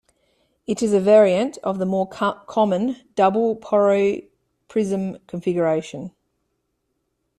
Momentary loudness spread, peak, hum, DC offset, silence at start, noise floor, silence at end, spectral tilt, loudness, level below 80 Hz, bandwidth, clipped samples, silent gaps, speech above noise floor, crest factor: 14 LU; -4 dBFS; none; under 0.1%; 0.7 s; -74 dBFS; 1.3 s; -6.5 dB/octave; -20 LUFS; -62 dBFS; 11.5 kHz; under 0.1%; none; 54 dB; 18 dB